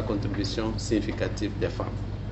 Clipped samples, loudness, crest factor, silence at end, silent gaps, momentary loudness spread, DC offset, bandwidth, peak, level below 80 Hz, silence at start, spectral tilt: under 0.1%; -29 LUFS; 16 dB; 0 s; none; 5 LU; under 0.1%; 8.4 kHz; -12 dBFS; -38 dBFS; 0 s; -6 dB/octave